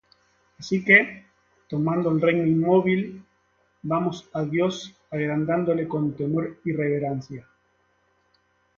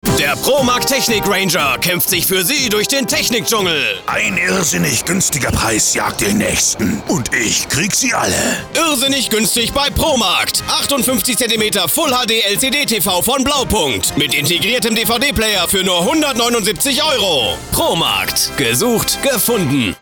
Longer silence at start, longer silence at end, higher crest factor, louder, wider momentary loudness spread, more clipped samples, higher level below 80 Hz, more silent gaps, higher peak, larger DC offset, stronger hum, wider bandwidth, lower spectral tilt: first, 0.6 s vs 0.05 s; first, 1.35 s vs 0.05 s; first, 24 dB vs 12 dB; second, -23 LUFS vs -13 LUFS; first, 16 LU vs 2 LU; neither; second, -62 dBFS vs -36 dBFS; neither; about the same, -2 dBFS vs -4 dBFS; neither; neither; second, 7.4 kHz vs over 20 kHz; first, -7 dB/octave vs -2.5 dB/octave